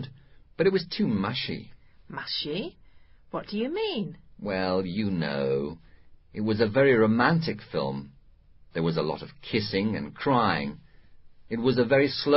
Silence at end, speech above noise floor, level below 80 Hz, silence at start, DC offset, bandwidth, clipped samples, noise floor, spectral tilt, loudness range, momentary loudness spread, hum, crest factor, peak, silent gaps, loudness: 0 s; 28 dB; -56 dBFS; 0 s; under 0.1%; 5.8 kHz; under 0.1%; -54 dBFS; -10 dB/octave; 6 LU; 16 LU; none; 20 dB; -8 dBFS; none; -27 LUFS